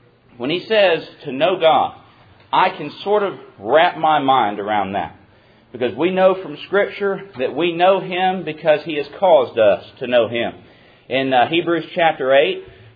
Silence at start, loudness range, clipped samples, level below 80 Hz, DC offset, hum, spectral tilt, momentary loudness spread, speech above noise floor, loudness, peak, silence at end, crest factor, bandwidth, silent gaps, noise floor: 0.4 s; 2 LU; under 0.1%; -62 dBFS; under 0.1%; none; -8 dB/octave; 10 LU; 33 dB; -18 LUFS; -2 dBFS; 0.25 s; 16 dB; 5 kHz; none; -50 dBFS